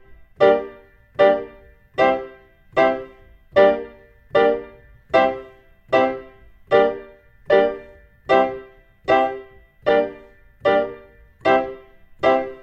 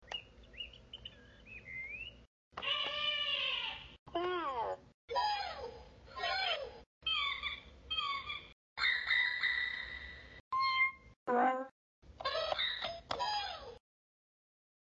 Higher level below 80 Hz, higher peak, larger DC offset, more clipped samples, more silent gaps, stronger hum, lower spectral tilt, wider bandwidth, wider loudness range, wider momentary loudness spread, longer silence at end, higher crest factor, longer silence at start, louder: first, -52 dBFS vs -64 dBFS; first, -2 dBFS vs -20 dBFS; neither; neither; second, none vs 2.27-2.51 s, 3.99-4.06 s, 4.94-5.08 s, 6.86-7.01 s, 8.52-8.76 s, 10.40-10.51 s, 11.16-11.26 s, 11.71-12.02 s; neither; first, -6 dB/octave vs 1 dB/octave; about the same, 7.6 kHz vs 8 kHz; about the same, 2 LU vs 4 LU; about the same, 17 LU vs 18 LU; second, 0.05 s vs 1.1 s; about the same, 18 dB vs 20 dB; about the same, 0.1 s vs 0 s; first, -20 LUFS vs -36 LUFS